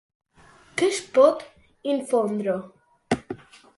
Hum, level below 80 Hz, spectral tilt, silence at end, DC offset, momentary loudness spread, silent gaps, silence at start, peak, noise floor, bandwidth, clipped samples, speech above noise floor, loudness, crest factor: none; -62 dBFS; -4.5 dB/octave; 0.4 s; under 0.1%; 16 LU; none; 0.75 s; -4 dBFS; -54 dBFS; 11.5 kHz; under 0.1%; 32 dB; -24 LUFS; 20 dB